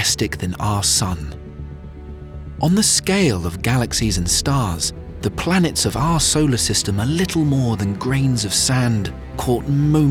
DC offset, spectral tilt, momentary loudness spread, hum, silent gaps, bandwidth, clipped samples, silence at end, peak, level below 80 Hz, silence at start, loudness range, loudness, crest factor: under 0.1%; -4 dB/octave; 17 LU; none; none; 17.5 kHz; under 0.1%; 0 s; -4 dBFS; -34 dBFS; 0 s; 2 LU; -18 LUFS; 14 dB